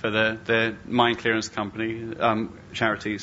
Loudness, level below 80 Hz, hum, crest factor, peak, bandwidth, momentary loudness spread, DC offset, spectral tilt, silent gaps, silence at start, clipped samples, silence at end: -25 LUFS; -56 dBFS; none; 20 dB; -6 dBFS; 8 kHz; 8 LU; under 0.1%; -3 dB/octave; none; 0 s; under 0.1%; 0 s